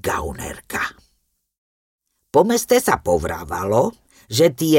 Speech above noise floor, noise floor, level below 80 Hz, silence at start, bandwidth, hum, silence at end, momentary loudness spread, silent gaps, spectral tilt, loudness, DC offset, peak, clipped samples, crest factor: 50 dB; -68 dBFS; -42 dBFS; 0.05 s; 17 kHz; none; 0 s; 11 LU; 1.58-1.99 s; -4.5 dB/octave; -20 LUFS; under 0.1%; -2 dBFS; under 0.1%; 18 dB